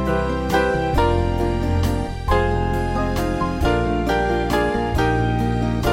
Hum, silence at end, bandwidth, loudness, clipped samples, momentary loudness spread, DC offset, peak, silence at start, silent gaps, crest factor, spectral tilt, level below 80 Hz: none; 0 s; 16.5 kHz; -20 LUFS; under 0.1%; 3 LU; under 0.1%; -4 dBFS; 0 s; none; 14 dB; -6.5 dB/octave; -26 dBFS